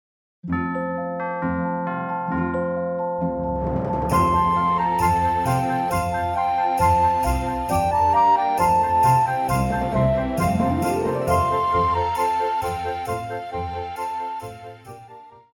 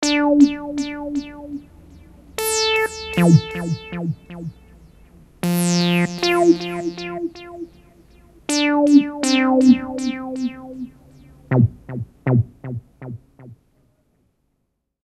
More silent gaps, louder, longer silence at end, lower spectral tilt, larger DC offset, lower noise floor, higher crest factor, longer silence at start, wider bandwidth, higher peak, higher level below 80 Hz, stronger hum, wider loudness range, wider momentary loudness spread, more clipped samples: neither; second, -22 LUFS vs -19 LUFS; second, 0.2 s vs 1.5 s; about the same, -6.5 dB/octave vs -5.5 dB/octave; neither; second, -44 dBFS vs -72 dBFS; about the same, 16 dB vs 20 dB; first, 0.45 s vs 0 s; first, 19 kHz vs 15.5 kHz; second, -6 dBFS vs -2 dBFS; first, -38 dBFS vs -50 dBFS; neither; about the same, 6 LU vs 6 LU; second, 11 LU vs 20 LU; neither